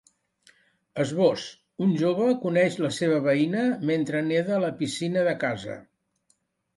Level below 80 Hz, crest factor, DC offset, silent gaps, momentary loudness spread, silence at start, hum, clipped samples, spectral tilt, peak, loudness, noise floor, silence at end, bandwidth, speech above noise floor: -70 dBFS; 18 dB; under 0.1%; none; 11 LU; 0.95 s; none; under 0.1%; -6 dB/octave; -8 dBFS; -25 LUFS; -70 dBFS; 0.95 s; 11.5 kHz; 46 dB